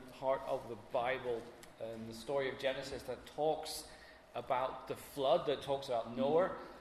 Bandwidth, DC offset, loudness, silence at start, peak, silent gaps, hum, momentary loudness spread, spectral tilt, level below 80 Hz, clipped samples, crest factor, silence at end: 13.5 kHz; under 0.1%; -38 LUFS; 0 s; -20 dBFS; none; none; 13 LU; -4.5 dB/octave; -66 dBFS; under 0.1%; 20 dB; 0 s